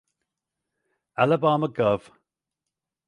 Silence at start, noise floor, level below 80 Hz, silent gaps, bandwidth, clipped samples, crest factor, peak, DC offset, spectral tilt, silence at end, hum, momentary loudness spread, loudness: 1.2 s; -86 dBFS; -64 dBFS; none; 10.5 kHz; under 0.1%; 22 dB; -6 dBFS; under 0.1%; -8 dB/octave; 1.1 s; none; 8 LU; -23 LUFS